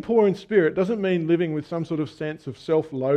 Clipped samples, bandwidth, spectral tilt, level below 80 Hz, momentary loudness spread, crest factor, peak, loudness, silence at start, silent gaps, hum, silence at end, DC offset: under 0.1%; 9.2 kHz; -8 dB/octave; -62 dBFS; 10 LU; 16 dB; -6 dBFS; -23 LUFS; 0.05 s; none; none; 0 s; under 0.1%